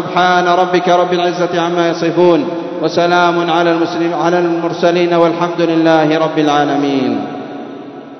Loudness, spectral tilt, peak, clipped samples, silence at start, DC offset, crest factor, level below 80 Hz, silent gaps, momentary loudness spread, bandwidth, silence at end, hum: -13 LUFS; -6 dB/octave; 0 dBFS; under 0.1%; 0 s; under 0.1%; 12 dB; -62 dBFS; none; 8 LU; 6.4 kHz; 0 s; none